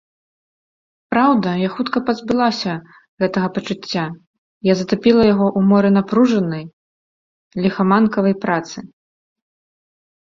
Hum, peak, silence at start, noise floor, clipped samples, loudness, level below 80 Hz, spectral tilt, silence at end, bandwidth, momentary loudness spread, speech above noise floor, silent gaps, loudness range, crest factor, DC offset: none; -2 dBFS; 1.1 s; under -90 dBFS; under 0.1%; -17 LUFS; -54 dBFS; -7 dB/octave; 1.4 s; 7.4 kHz; 11 LU; over 74 dB; 3.08-3.17 s, 4.27-4.61 s, 6.73-7.51 s; 4 LU; 16 dB; under 0.1%